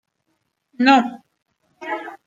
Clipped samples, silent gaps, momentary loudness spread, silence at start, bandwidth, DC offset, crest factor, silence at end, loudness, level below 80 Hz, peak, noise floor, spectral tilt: under 0.1%; none; 15 LU; 0.8 s; 7.6 kHz; under 0.1%; 20 dB; 0.1 s; -18 LUFS; -72 dBFS; -2 dBFS; -72 dBFS; -4 dB/octave